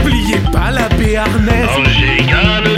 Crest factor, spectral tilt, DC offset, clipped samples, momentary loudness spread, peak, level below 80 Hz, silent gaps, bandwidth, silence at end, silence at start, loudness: 12 dB; -5.5 dB/octave; under 0.1%; under 0.1%; 4 LU; 0 dBFS; -18 dBFS; none; 16 kHz; 0 s; 0 s; -12 LUFS